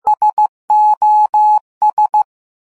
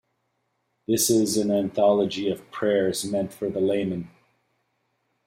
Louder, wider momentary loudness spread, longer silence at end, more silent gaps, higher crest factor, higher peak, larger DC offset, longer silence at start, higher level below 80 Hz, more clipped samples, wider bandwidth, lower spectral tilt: first, -13 LUFS vs -24 LUFS; second, 6 LU vs 9 LU; second, 0.55 s vs 1.2 s; first, 0.33-0.37 s, 0.49-0.68 s, 0.97-1.01 s, 1.29-1.33 s, 1.61-1.81 s, 1.93-1.97 s vs none; second, 8 dB vs 16 dB; about the same, -6 dBFS vs -8 dBFS; first, 0.3% vs under 0.1%; second, 0.05 s vs 0.9 s; about the same, -62 dBFS vs -66 dBFS; neither; second, 8 kHz vs 16 kHz; second, -2.5 dB/octave vs -4.5 dB/octave